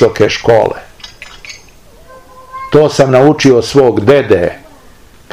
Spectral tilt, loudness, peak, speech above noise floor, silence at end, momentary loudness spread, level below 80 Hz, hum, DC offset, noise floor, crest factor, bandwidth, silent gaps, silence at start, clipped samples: -6 dB/octave; -9 LUFS; 0 dBFS; 32 dB; 0.75 s; 23 LU; -40 dBFS; none; 0.7%; -40 dBFS; 12 dB; 15 kHz; none; 0 s; 3%